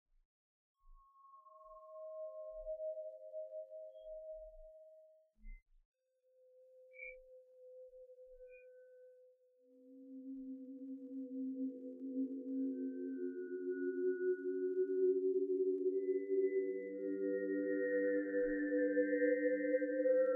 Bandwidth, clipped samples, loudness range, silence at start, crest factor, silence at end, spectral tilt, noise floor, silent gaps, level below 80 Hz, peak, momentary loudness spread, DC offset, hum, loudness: 2.6 kHz; under 0.1%; 21 LU; 0.85 s; 16 dB; 0 s; -1.5 dB/octave; -74 dBFS; 5.62-5.66 s, 5.85-5.92 s; -70 dBFS; -24 dBFS; 23 LU; under 0.1%; none; -39 LUFS